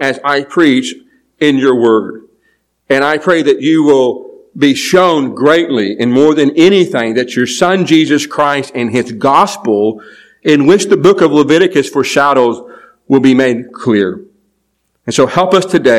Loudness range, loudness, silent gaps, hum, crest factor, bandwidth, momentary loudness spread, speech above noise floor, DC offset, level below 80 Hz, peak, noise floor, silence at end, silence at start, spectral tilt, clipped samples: 3 LU; -10 LUFS; none; none; 10 dB; 14.5 kHz; 7 LU; 54 dB; under 0.1%; -56 dBFS; 0 dBFS; -63 dBFS; 0 s; 0 s; -5 dB/octave; 1%